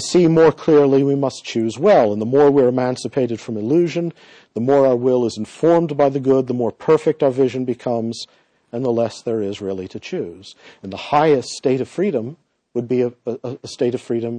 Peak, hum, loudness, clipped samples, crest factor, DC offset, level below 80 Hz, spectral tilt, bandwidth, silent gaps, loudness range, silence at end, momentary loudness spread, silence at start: -4 dBFS; none; -18 LUFS; under 0.1%; 14 dB; under 0.1%; -60 dBFS; -6.5 dB/octave; 10 kHz; none; 6 LU; 0 s; 14 LU; 0 s